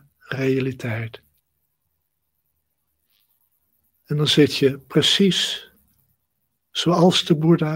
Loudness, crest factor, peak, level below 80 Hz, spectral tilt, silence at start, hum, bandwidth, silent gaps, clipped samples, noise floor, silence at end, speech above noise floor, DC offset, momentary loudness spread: -19 LUFS; 18 dB; -4 dBFS; -62 dBFS; -5 dB/octave; 0.3 s; none; 16.5 kHz; none; under 0.1%; -75 dBFS; 0 s; 56 dB; under 0.1%; 13 LU